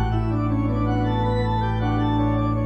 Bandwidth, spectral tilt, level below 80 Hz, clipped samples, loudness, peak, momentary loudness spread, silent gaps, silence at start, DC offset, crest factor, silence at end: 5.6 kHz; -9 dB/octave; -30 dBFS; under 0.1%; -22 LUFS; -10 dBFS; 2 LU; none; 0 s; under 0.1%; 10 dB; 0 s